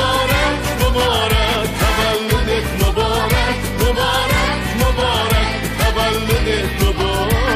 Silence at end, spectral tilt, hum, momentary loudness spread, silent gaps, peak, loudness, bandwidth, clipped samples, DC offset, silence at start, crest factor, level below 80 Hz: 0 s; -4.5 dB/octave; none; 3 LU; none; -4 dBFS; -16 LUFS; 16 kHz; under 0.1%; under 0.1%; 0 s; 12 dB; -22 dBFS